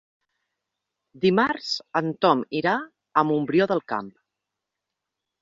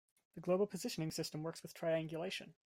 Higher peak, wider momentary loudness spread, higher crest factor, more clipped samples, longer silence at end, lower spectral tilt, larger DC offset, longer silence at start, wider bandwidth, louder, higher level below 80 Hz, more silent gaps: first, -6 dBFS vs -24 dBFS; second, 7 LU vs 10 LU; about the same, 20 dB vs 16 dB; neither; first, 1.3 s vs 0.15 s; about the same, -6 dB/octave vs -5 dB/octave; neither; first, 1.15 s vs 0.35 s; second, 7.6 kHz vs 16 kHz; first, -24 LUFS vs -41 LUFS; first, -66 dBFS vs -78 dBFS; neither